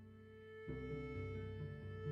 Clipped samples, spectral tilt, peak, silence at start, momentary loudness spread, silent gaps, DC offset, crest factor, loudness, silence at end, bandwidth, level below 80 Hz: under 0.1%; -9 dB/octave; -34 dBFS; 0 s; 11 LU; none; under 0.1%; 14 dB; -49 LUFS; 0 s; 6 kHz; -60 dBFS